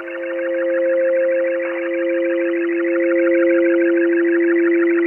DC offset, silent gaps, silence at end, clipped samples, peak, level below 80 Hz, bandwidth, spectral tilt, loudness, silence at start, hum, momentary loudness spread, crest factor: under 0.1%; none; 0 s; under 0.1%; -6 dBFS; -72 dBFS; 3.2 kHz; -7 dB/octave; -17 LUFS; 0 s; none; 6 LU; 10 dB